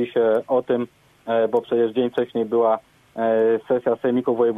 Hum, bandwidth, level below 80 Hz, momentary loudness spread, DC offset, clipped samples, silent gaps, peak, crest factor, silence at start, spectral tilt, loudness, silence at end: none; 3.9 kHz; -66 dBFS; 6 LU; under 0.1%; under 0.1%; none; -8 dBFS; 14 dB; 0 s; -8 dB/octave; -21 LUFS; 0 s